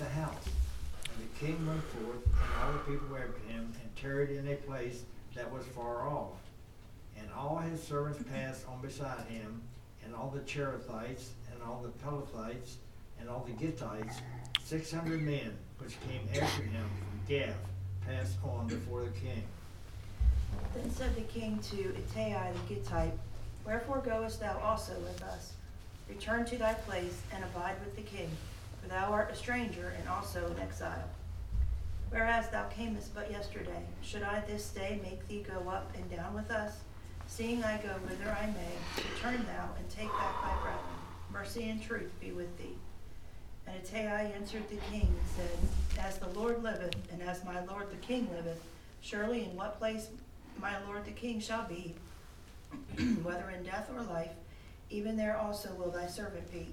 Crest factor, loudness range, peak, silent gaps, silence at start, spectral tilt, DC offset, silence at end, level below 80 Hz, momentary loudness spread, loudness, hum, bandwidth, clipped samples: 26 dB; 4 LU; -10 dBFS; none; 0 s; -5.5 dB/octave; under 0.1%; 0 s; -44 dBFS; 13 LU; -39 LUFS; none; 16.5 kHz; under 0.1%